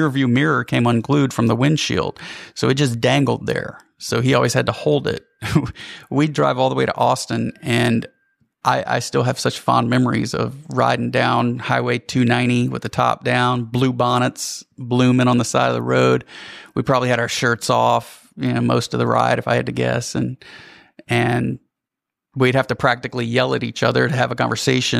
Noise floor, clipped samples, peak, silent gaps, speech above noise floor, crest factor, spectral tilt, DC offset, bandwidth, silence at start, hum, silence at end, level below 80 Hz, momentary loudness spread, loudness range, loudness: -84 dBFS; under 0.1%; -2 dBFS; none; 66 dB; 18 dB; -5.5 dB/octave; under 0.1%; 15 kHz; 0 s; none; 0 s; -52 dBFS; 9 LU; 2 LU; -19 LUFS